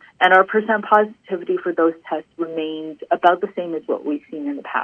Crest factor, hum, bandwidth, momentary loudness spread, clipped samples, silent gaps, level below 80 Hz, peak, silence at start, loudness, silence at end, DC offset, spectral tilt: 20 dB; none; 6.6 kHz; 14 LU; under 0.1%; none; -74 dBFS; 0 dBFS; 0.2 s; -20 LUFS; 0 s; under 0.1%; -6.5 dB/octave